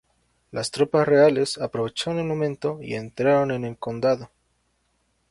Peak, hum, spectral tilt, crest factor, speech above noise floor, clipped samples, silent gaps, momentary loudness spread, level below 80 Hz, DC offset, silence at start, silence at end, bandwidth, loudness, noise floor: -6 dBFS; none; -5.5 dB/octave; 18 dB; 47 dB; under 0.1%; none; 13 LU; -60 dBFS; under 0.1%; 0.55 s; 1.05 s; 11.5 kHz; -23 LUFS; -69 dBFS